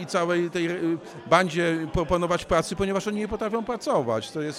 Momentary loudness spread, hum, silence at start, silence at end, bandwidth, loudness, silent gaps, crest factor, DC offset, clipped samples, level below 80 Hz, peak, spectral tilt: 7 LU; none; 0 s; 0 s; 14.5 kHz; -25 LUFS; none; 20 dB; under 0.1%; under 0.1%; -44 dBFS; -6 dBFS; -5.5 dB/octave